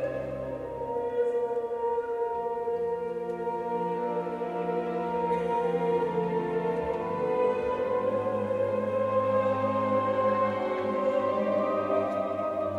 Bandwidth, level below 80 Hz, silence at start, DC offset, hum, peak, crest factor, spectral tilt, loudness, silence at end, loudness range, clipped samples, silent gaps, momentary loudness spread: 9.2 kHz; -60 dBFS; 0 s; under 0.1%; none; -14 dBFS; 14 dB; -8 dB/octave; -29 LUFS; 0 s; 4 LU; under 0.1%; none; 6 LU